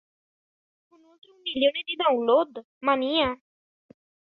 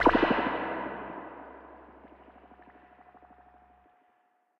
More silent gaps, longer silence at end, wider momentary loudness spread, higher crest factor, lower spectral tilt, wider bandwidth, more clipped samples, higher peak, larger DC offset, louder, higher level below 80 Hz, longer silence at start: first, 2.65-2.81 s vs none; second, 0.95 s vs 1.9 s; second, 11 LU vs 29 LU; about the same, 20 dB vs 24 dB; about the same, -6.5 dB/octave vs -7 dB/octave; second, 5 kHz vs 7.4 kHz; neither; about the same, -8 dBFS vs -8 dBFS; neither; first, -25 LUFS vs -30 LUFS; second, -62 dBFS vs -54 dBFS; first, 1.45 s vs 0 s